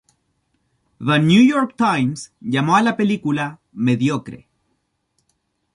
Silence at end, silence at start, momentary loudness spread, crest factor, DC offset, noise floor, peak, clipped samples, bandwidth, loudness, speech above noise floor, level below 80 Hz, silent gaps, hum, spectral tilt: 1.4 s; 1 s; 14 LU; 18 dB; under 0.1%; -70 dBFS; -2 dBFS; under 0.1%; 11 kHz; -18 LUFS; 53 dB; -60 dBFS; none; none; -6 dB/octave